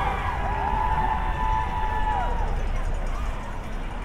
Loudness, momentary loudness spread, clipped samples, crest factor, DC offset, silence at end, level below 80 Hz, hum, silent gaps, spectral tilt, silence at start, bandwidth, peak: -28 LUFS; 9 LU; under 0.1%; 12 dB; under 0.1%; 0 s; -28 dBFS; none; none; -6 dB/octave; 0 s; 9.8 kHz; -12 dBFS